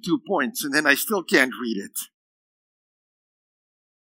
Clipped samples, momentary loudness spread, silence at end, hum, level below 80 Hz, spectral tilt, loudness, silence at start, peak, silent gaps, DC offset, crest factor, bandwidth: under 0.1%; 13 LU; 2.1 s; none; -88 dBFS; -3 dB/octave; -22 LUFS; 0.05 s; -2 dBFS; none; under 0.1%; 24 dB; 16.5 kHz